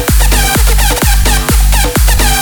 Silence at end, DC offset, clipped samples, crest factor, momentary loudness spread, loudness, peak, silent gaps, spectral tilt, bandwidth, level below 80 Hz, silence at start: 0 s; under 0.1%; under 0.1%; 8 dB; 1 LU; -10 LUFS; 0 dBFS; none; -3.5 dB/octave; over 20 kHz; -10 dBFS; 0 s